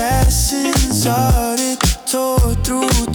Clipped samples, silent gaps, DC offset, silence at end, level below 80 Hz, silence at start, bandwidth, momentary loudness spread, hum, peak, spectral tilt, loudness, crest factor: under 0.1%; none; under 0.1%; 0 s; -20 dBFS; 0 s; over 20 kHz; 3 LU; none; -4 dBFS; -4 dB/octave; -16 LUFS; 12 dB